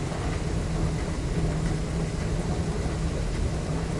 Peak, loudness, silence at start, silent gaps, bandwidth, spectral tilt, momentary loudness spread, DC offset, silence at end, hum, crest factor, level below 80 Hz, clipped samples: -14 dBFS; -29 LUFS; 0 s; none; 11.5 kHz; -6.5 dB/octave; 2 LU; under 0.1%; 0 s; none; 12 dB; -32 dBFS; under 0.1%